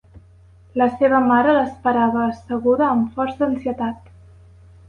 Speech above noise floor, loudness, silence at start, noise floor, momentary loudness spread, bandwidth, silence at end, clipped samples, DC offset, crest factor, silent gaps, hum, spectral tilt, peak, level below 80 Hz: 30 dB; -19 LUFS; 0.15 s; -48 dBFS; 10 LU; 5.2 kHz; 0.95 s; under 0.1%; under 0.1%; 16 dB; none; none; -8 dB/octave; -4 dBFS; -50 dBFS